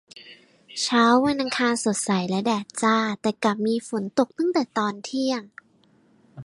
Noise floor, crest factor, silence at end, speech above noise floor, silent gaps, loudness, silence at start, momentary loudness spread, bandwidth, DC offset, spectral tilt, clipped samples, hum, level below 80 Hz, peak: -60 dBFS; 18 dB; 0 s; 37 dB; none; -23 LUFS; 0.15 s; 8 LU; 11.5 kHz; under 0.1%; -4 dB/octave; under 0.1%; none; -68 dBFS; -6 dBFS